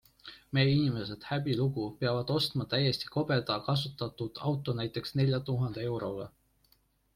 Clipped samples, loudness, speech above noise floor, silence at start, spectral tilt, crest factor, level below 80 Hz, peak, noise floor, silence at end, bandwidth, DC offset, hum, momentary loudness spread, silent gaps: under 0.1%; -32 LUFS; 39 dB; 0.25 s; -7 dB/octave; 16 dB; -62 dBFS; -16 dBFS; -70 dBFS; 0.85 s; 15 kHz; under 0.1%; none; 8 LU; none